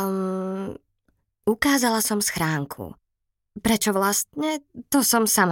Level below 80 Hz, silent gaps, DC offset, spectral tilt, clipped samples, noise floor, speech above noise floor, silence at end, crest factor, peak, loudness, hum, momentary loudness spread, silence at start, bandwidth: -54 dBFS; none; under 0.1%; -3.5 dB/octave; under 0.1%; -78 dBFS; 56 dB; 0 s; 18 dB; -6 dBFS; -23 LUFS; none; 14 LU; 0 s; 17 kHz